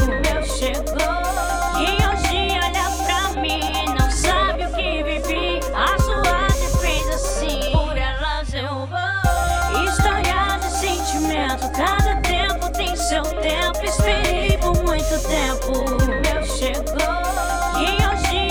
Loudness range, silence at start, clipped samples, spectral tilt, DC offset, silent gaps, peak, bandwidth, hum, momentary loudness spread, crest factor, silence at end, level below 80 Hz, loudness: 1 LU; 0 s; under 0.1%; -4 dB/octave; under 0.1%; none; -4 dBFS; 20 kHz; none; 4 LU; 16 dB; 0 s; -24 dBFS; -20 LUFS